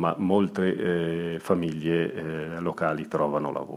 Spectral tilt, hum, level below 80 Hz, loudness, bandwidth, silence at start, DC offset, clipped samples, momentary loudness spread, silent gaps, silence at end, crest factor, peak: -7.5 dB/octave; none; -60 dBFS; -27 LUFS; 14.5 kHz; 0 s; under 0.1%; under 0.1%; 7 LU; none; 0 s; 18 dB; -8 dBFS